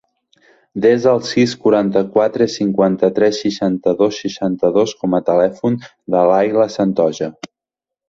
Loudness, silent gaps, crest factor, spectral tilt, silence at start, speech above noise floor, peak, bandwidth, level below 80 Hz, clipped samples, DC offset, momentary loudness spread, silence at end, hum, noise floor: -16 LUFS; none; 14 dB; -6 dB/octave; 0.75 s; 70 dB; -2 dBFS; 7.8 kHz; -56 dBFS; under 0.1%; under 0.1%; 7 LU; 0.65 s; none; -86 dBFS